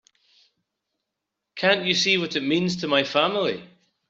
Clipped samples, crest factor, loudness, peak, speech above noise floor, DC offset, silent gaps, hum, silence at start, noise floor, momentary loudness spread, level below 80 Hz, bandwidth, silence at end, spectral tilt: under 0.1%; 22 dB; -22 LUFS; -4 dBFS; 61 dB; under 0.1%; none; none; 1.55 s; -83 dBFS; 8 LU; -68 dBFS; 7.8 kHz; 0.45 s; -4 dB/octave